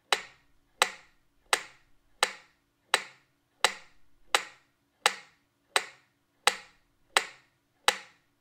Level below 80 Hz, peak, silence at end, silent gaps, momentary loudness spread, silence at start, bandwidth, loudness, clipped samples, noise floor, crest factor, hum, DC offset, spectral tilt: -74 dBFS; -4 dBFS; 0.4 s; none; 18 LU; 0.1 s; 16 kHz; -30 LUFS; under 0.1%; -68 dBFS; 30 dB; none; under 0.1%; 1.5 dB/octave